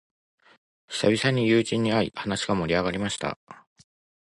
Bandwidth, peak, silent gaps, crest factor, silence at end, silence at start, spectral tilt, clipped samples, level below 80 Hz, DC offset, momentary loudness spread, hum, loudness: 11.5 kHz; -8 dBFS; 3.36-3.47 s; 18 dB; 0.8 s; 0.9 s; -5 dB/octave; under 0.1%; -54 dBFS; under 0.1%; 10 LU; none; -25 LUFS